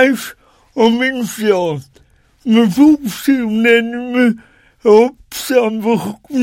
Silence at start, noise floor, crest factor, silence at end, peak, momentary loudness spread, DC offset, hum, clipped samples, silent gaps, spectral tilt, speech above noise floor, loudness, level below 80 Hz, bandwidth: 0 s; -50 dBFS; 14 dB; 0 s; 0 dBFS; 13 LU; under 0.1%; none; 0.1%; none; -5 dB/octave; 37 dB; -14 LUFS; -52 dBFS; 17 kHz